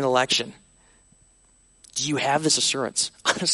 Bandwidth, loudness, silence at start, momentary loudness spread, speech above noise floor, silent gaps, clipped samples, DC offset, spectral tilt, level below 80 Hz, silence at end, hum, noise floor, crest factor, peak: 11.5 kHz; -22 LUFS; 0 s; 8 LU; 35 dB; none; under 0.1%; under 0.1%; -2 dB/octave; -62 dBFS; 0 s; none; -59 dBFS; 20 dB; -6 dBFS